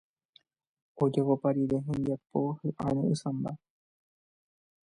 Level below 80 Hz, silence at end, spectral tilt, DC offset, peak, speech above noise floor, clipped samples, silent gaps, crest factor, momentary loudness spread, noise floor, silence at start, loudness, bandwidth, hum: -64 dBFS; 1.3 s; -8.5 dB/octave; under 0.1%; -14 dBFS; 37 dB; under 0.1%; none; 18 dB; 7 LU; -66 dBFS; 0.95 s; -31 LUFS; 10.5 kHz; none